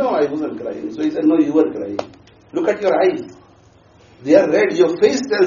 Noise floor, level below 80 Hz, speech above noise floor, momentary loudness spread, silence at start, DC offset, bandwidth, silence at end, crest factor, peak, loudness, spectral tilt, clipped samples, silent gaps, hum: -49 dBFS; -60 dBFS; 33 dB; 13 LU; 0 s; under 0.1%; 7.2 kHz; 0 s; 16 dB; 0 dBFS; -17 LUFS; -4.5 dB/octave; under 0.1%; none; none